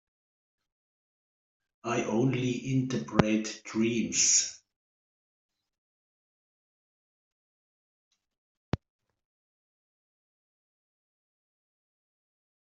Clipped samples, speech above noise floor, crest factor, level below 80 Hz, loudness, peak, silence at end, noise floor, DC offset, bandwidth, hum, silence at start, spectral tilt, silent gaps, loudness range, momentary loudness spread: under 0.1%; over 62 dB; 34 dB; -60 dBFS; -28 LUFS; 0 dBFS; 3.9 s; under -90 dBFS; under 0.1%; 8.2 kHz; none; 1.85 s; -3.5 dB/octave; 4.76-5.49 s, 5.78-8.11 s, 8.38-8.72 s; 19 LU; 16 LU